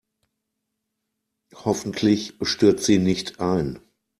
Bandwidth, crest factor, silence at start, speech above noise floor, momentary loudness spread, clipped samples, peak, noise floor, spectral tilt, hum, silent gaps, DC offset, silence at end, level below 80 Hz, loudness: 13.5 kHz; 20 dB; 1.55 s; 58 dB; 10 LU; under 0.1%; -4 dBFS; -80 dBFS; -5 dB/octave; none; none; under 0.1%; 0.4 s; -54 dBFS; -22 LUFS